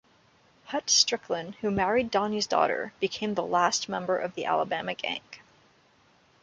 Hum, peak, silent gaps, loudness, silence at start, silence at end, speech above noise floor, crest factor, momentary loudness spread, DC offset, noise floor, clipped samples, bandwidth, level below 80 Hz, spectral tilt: none; -6 dBFS; none; -27 LUFS; 0.65 s; 1.05 s; 35 dB; 22 dB; 10 LU; under 0.1%; -63 dBFS; under 0.1%; 11 kHz; -62 dBFS; -2.5 dB/octave